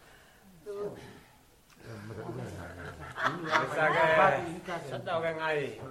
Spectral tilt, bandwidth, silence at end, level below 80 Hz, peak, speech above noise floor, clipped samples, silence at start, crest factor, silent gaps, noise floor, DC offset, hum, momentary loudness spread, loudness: -5 dB/octave; 15.5 kHz; 0 s; -62 dBFS; -8 dBFS; 32 dB; under 0.1%; 0.1 s; 24 dB; none; -60 dBFS; under 0.1%; none; 20 LU; -30 LUFS